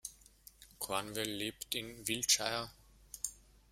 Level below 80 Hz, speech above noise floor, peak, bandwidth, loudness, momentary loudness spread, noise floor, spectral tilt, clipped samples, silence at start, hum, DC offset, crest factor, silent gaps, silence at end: -66 dBFS; 24 dB; -14 dBFS; 16 kHz; -36 LUFS; 19 LU; -61 dBFS; -1 dB/octave; under 0.1%; 0.05 s; none; under 0.1%; 26 dB; none; 0.35 s